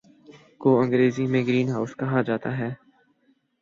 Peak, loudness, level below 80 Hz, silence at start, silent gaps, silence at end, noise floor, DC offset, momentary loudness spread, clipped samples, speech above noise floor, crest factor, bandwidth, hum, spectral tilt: -8 dBFS; -24 LUFS; -66 dBFS; 0.3 s; none; 0.85 s; -66 dBFS; under 0.1%; 10 LU; under 0.1%; 43 dB; 18 dB; 7.4 kHz; none; -8 dB/octave